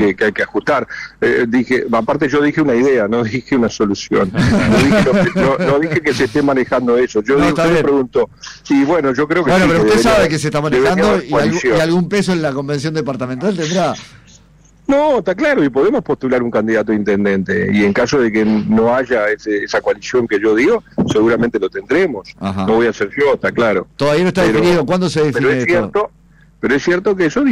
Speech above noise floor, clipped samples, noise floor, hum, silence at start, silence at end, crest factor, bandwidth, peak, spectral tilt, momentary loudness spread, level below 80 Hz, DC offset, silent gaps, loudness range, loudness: 33 dB; under 0.1%; -47 dBFS; none; 0 s; 0 s; 8 dB; 14.5 kHz; -6 dBFS; -6 dB/octave; 6 LU; -40 dBFS; under 0.1%; none; 3 LU; -14 LUFS